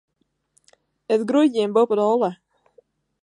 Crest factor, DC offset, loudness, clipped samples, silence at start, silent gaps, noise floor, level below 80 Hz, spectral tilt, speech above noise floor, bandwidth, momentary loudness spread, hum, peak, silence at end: 18 dB; under 0.1%; -20 LUFS; under 0.1%; 1.1 s; none; -66 dBFS; -76 dBFS; -6.5 dB/octave; 47 dB; 10.5 kHz; 5 LU; none; -6 dBFS; 0.9 s